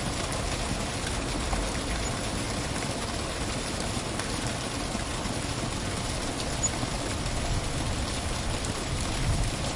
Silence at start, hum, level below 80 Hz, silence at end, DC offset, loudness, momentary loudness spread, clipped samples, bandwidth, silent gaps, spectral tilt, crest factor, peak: 0 s; none; -36 dBFS; 0 s; under 0.1%; -30 LUFS; 2 LU; under 0.1%; 11.5 kHz; none; -3.5 dB/octave; 18 dB; -12 dBFS